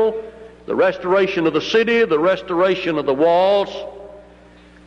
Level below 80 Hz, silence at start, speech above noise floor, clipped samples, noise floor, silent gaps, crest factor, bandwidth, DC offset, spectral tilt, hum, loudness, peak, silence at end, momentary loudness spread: -52 dBFS; 0 s; 29 dB; under 0.1%; -45 dBFS; none; 14 dB; 7.6 kHz; under 0.1%; -5.5 dB/octave; 60 Hz at -50 dBFS; -17 LUFS; -6 dBFS; 0.65 s; 16 LU